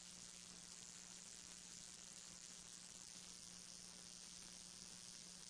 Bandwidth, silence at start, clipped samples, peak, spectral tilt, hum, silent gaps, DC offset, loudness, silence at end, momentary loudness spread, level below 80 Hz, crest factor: 11 kHz; 0 s; under 0.1%; -38 dBFS; -0.5 dB/octave; none; none; under 0.1%; -55 LUFS; 0 s; 1 LU; -80 dBFS; 20 dB